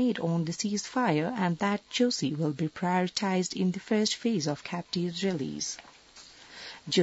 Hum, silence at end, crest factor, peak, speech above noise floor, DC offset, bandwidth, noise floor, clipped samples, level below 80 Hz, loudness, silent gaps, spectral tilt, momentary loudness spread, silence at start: none; 0 s; 18 dB; -12 dBFS; 24 dB; under 0.1%; 8 kHz; -53 dBFS; under 0.1%; -70 dBFS; -29 LUFS; none; -4.5 dB/octave; 12 LU; 0 s